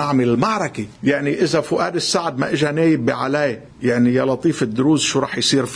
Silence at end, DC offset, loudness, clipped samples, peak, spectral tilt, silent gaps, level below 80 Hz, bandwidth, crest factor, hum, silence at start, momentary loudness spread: 0 s; under 0.1%; -18 LUFS; under 0.1%; -2 dBFS; -4.5 dB/octave; none; -54 dBFS; 10.5 kHz; 16 dB; none; 0 s; 5 LU